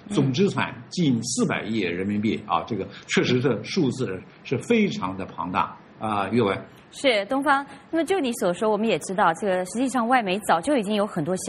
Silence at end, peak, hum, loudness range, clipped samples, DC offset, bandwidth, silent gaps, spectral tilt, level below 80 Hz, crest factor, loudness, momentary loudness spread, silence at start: 0 s; -6 dBFS; none; 2 LU; under 0.1%; under 0.1%; 13 kHz; none; -5 dB/octave; -62 dBFS; 18 dB; -24 LUFS; 9 LU; 0.05 s